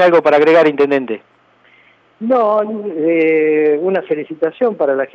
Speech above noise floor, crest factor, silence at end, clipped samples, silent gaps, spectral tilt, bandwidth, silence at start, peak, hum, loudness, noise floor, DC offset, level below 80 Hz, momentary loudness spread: 37 dB; 14 dB; 0.05 s; under 0.1%; none; -7 dB/octave; 6.6 kHz; 0 s; 0 dBFS; none; -14 LUFS; -50 dBFS; under 0.1%; -72 dBFS; 11 LU